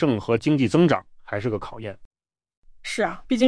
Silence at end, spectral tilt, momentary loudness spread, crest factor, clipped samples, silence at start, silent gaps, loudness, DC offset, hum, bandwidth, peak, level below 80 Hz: 0 s; -6.5 dB/octave; 17 LU; 18 dB; under 0.1%; 0 s; 2.05-2.11 s, 2.57-2.62 s; -23 LUFS; under 0.1%; none; 10.5 kHz; -6 dBFS; -52 dBFS